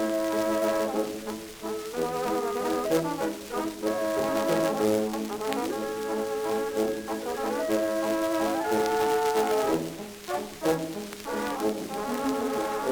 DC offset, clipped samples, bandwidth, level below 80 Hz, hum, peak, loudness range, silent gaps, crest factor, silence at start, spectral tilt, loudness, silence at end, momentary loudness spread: under 0.1%; under 0.1%; over 20 kHz; -58 dBFS; none; -10 dBFS; 3 LU; none; 18 dB; 0 s; -4.5 dB/octave; -28 LUFS; 0 s; 8 LU